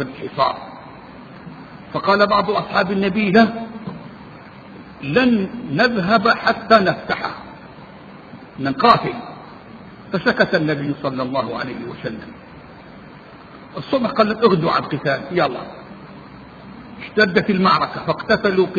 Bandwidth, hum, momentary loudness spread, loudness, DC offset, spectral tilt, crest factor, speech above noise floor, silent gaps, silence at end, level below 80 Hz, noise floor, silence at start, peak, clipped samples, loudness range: 7 kHz; none; 24 LU; -18 LUFS; under 0.1%; -7 dB/octave; 20 dB; 22 dB; none; 0 s; -52 dBFS; -40 dBFS; 0 s; 0 dBFS; under 0.1%; 5 LU